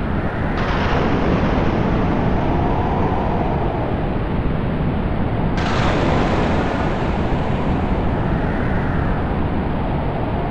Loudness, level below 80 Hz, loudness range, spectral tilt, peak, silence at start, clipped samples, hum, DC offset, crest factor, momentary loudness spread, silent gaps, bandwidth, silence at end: -20 LUFS; -26 dBFS; 2 LU; -8 dB/octave; -6 dBFS; 0 s; under 0.1%; none; under 0.1%; 12 dB; 4 LU; none; 8.8 kHz; 0 s